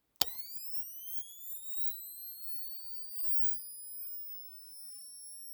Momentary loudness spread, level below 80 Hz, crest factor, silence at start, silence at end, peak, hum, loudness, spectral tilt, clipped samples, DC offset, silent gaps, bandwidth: 18 LU; -80 dBFS; 32 dB; 0.2 s; 0 s; -6 dBFS; none; -33 LUFS; 0.5 dB/octave; under 0.1%; under 0.1%; none; over 20 kHz